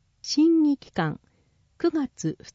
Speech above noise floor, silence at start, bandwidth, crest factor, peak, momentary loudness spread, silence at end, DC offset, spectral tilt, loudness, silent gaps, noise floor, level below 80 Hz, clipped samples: 41 dB; 0.25 s; 7.8 kHz; 14 dB; -12 dBFS; 11 LU; 0.2 s; under 0.1%; -5.5 dB/octave; -25 LUFS; none; -65 dBFS; -62 dBFS; under 0.1%